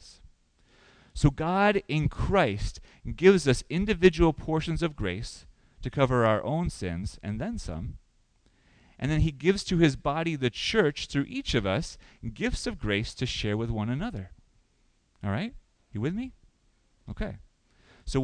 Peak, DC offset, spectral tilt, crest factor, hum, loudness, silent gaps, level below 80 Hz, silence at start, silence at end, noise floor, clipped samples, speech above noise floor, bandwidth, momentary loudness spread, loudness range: -6 dBFS; under 0.1%; -6 dB/octave; 24 dB; none; -28 LUFS; none; -40 dBFS; 0.05 s; 0 s; -67 dBFS; under 0.1%; 40 dB; 10.5 kHz; 18 LU; 10 LU